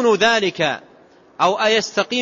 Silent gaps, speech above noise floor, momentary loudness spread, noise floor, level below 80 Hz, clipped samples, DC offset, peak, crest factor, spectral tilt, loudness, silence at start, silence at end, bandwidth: none; 32 dB; 7 LU; -49 dBFS; -62 dBFS; under 0.1%; under 0.1%; -4 dBFS; 16 dB; -3 dB/octave; -17 LUFS; 0 s; 0 s; 7.8 kHz